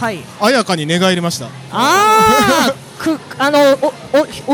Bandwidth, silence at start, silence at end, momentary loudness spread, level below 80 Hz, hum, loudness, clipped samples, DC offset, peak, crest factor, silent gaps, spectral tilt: 19 kHz; 0 s; 0 s; 11 LU; -48 dBFS; none; -13 LUFS; under 0.1%; under 0.1%; 0 dBFS; 12 dB; none; -4 dB/octave